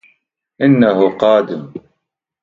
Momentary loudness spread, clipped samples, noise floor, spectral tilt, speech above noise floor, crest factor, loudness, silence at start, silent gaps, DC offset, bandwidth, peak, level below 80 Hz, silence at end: 19 LU; under 0.1%; -74 dBFS; -8.5 dB/octave; 62 dB; 16 dB; -13 LUFS; 0.6 s; none; under 0.1%; 7.2 kHz; 0 dBFS; -58 dBFS; 0.65 s